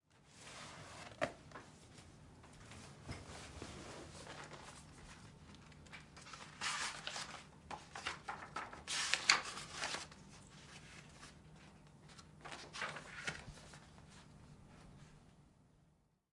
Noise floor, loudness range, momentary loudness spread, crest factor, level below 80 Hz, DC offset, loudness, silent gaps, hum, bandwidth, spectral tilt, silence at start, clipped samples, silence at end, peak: -74 dBFS; 14 LU; 20 LU; 38 dB; -68 dBFS; under 0.1%; -43 LUFS; none; none; 11.5 kHz; -1.5 dB/octave; 0.1 s; under 0.1%; 0.4 s; -10 dBFS